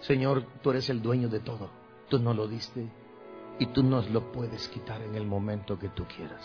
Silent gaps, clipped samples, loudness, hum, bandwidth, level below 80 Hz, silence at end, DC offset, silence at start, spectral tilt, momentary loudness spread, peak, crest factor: none; under 0.1%; -31 LUFS; none; 5.4 kHz; -56 dBFS; 0 s; under 0.1%; 0 s; -8 dB/octave; 15 LU; -12 dBFS; 18 dB